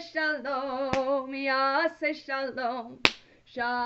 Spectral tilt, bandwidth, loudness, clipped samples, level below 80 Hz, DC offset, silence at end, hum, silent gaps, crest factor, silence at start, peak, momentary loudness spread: -3.5 dB/octave; 8.2 kHz; -28 LUFS; under 0.1%; -60 dBFS; under 0.1%; 0 s; none; none; 30 dB; 0 s; 0 dBFS; 8 LU